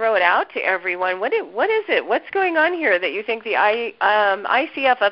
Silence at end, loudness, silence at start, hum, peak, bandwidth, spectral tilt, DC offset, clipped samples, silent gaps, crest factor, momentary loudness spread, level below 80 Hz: 0 s; -19 LUFS; 0 s; none; -2 dBFS; 5.6 kHz; -7 dB/octave; under 0.1%; under 0.1%; none; 18 dB; 5 LU; -66 dBFS